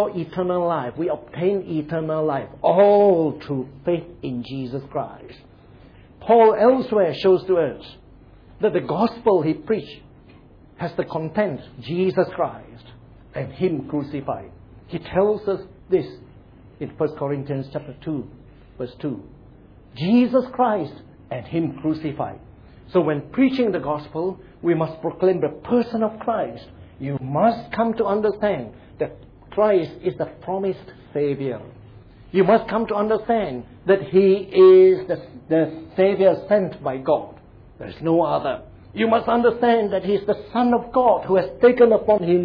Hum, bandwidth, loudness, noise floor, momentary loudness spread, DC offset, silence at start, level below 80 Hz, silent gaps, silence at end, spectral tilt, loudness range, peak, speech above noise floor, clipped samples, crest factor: none; 5.2 kHz; -21 LUFS; -48 dBFS; 14 LU; under 0.1%; 0 s; -52 dBFS; none; 0 s; -9.5 dB/octave; 9 LU; -4 dBFS; 28 dB; under 0.1%; 16 dB